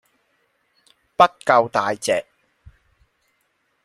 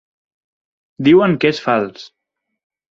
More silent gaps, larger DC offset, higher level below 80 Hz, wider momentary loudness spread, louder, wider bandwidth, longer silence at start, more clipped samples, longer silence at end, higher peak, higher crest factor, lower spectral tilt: neither; neither; about the same, -60 dBFS vs -56 dBFS; about the same, 8 LU vs 7 LU; second, -19 LUFS vs -14 LUFS; first, 15 kHz vs 7.4 kHz; first, 1.2 s vs 1 s; neither; first, 1.65 s vs 0.85 s; about the same, 0 dBFS vs -2 dBFS; first, 22 dB vs 16 dB; second, -3.5 dB/octave vs -7 dB/octave